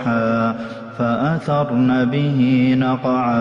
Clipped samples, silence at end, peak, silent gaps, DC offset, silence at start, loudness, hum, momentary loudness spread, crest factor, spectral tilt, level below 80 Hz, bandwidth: under 0.1%; 0 s; -8 dBFS; none; under 0.1%; 0 s; -18 LUFS; none; 7 LU; 10 dB; -8.5 dB/octave; -52 dBFS; 6.2 kHz